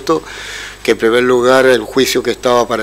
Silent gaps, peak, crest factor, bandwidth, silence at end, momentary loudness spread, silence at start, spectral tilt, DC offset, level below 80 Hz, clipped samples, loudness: none; 0 dBFS; 12 dB; 16 kHz; 0 s; 13 LU; 0 s; -3.5 dB/octave; under 0.1%; -42 dBFS; under 0.1%; -12 LUFS